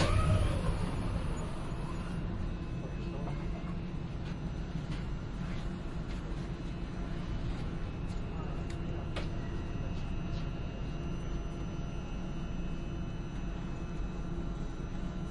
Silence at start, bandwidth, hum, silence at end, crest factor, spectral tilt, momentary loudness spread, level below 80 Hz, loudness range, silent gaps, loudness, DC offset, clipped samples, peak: 0 s; 11.5 kHz; none; 0 s; 20 dB; -7 dB/octave; 5 LU; -40 dBFS; 2 LU; none; -39 LUFS; under 0.1%; under 0.1%; -14 dBFS